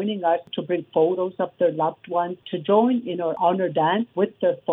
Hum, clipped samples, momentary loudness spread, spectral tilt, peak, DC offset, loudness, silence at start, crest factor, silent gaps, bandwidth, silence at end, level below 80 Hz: none; under 0.1%; 7 LU; -9.5 dB/octave; -6 dBFS; under 0.1%; -23 LUFS; 0 s; 16 dB; none; 4 kHz; 0 s; -76 dBFS